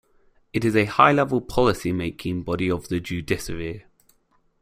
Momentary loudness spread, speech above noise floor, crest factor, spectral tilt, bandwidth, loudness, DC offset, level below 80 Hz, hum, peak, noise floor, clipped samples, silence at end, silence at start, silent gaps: 14 LU; 42 dB; 22 dB; -6 dB/octave; 16 kHz; -23 LUFS; under 0.1%; -44 dBFS; none; -2 dBFS; -64 dBFS; under 0.1%; 0.8 s; 0.55 s; none